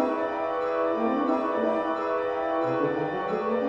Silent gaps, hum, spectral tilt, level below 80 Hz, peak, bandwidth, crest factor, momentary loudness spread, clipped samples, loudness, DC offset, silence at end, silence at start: none; none; -7.5 dB/octave; -62 dBFS; -14 dBFS; 7.4 kHz; 14 dB; 3 LU; under 0.1%; -27 LUFS; under 0.1%; 0 s; 0 s